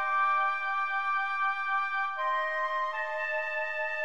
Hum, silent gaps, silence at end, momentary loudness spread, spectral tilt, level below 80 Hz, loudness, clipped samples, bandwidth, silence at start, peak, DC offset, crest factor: none; none; 0 s; 5 LU; 0 dB/octave; -84 dBFS; -29 LUFS; under 0.1%; 10.5 kHz; 0 s; -18 dBFS; 0.4%; 12 dB